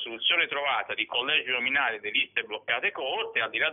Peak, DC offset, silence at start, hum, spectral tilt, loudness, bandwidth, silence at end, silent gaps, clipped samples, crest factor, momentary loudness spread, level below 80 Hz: -10 dBFS; under 0.1%; 0 s; none; 2.5 dB/octave; -26 LUFS; 4.1 kHz; 0 s; none; under 0.1%; 18 dB; 5 LU; -74 dBFS